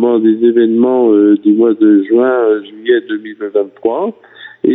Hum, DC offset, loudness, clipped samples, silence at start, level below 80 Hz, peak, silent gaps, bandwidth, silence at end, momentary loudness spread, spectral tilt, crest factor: none; under 0.1%; -11 LUFS; under 0.1%; 0 s; -64 dBFS; 0 dBFS; none; 3.9 kHz; 0 s; 9 LU; -10 dB/octave; 10 dB